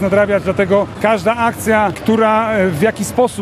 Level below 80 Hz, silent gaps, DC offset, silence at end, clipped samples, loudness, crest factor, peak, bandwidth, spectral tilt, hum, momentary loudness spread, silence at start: -44 dBFS; none; under 0.1%; 0 s; under 0.1%; -14 LUFS; 14 dB; 0 dBFS; 14.5 kHz; -5.5 dB/octave; none; 3 LU; 0 s